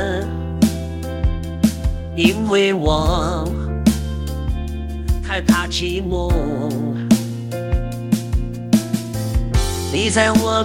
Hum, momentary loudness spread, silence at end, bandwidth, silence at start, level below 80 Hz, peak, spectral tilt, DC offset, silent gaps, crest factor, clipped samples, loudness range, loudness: none; 9 LU; 0 s; 17 kHz; 0 s; -26 dBFS; 0 dBFS; -5.5 dB/octave; under 0.1%; none; 18 dB; under 0.1%; 2 LU; -20 LUFS